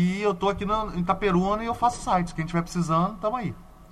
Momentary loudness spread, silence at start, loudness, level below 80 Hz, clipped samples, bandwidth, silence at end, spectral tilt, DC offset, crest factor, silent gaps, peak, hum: 5 LU; 0 s; -26 LUFS; -42 dBFS; under 0.1%; 12.5 kHz; 0.05 s; -6.5 dB/octave; under 0.1%; 16 dB; none; -8 dBFS; none